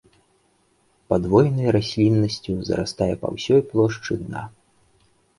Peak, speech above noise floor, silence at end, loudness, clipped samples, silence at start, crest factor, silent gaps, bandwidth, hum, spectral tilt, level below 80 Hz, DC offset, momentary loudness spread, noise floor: -2 dBFS; 43 dB; 0.9 s; -21 LUFS; under 0.1%; 1.1 s; 20 dB; none; 11.5 kHz; none; -7 dB/octave; -46 dBFS; under 0.1%; 10 LU; -63 dBFS